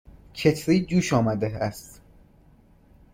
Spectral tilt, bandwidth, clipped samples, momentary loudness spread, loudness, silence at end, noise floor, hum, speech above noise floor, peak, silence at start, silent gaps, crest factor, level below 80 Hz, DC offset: -6 dB/octave; 16.5 kHz; under 0.1%; 13 LU; -24 LUFS; 1.25 s; -55 dBFS; none; 32 dB; -6 dBFS; 0.35 s; none; 20 dB; -50 dBFS; under 0.1%